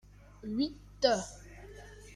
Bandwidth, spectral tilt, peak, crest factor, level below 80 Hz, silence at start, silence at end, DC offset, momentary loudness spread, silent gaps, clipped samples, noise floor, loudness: 13.5 kHz; -4 dB/octave; -12 dBFS; 24 dB; -56 dBFS; 0.4 s; 0 s; under 0.1%; 21 LU; none; under 0.1%; -50 dBFS; -33 LUFS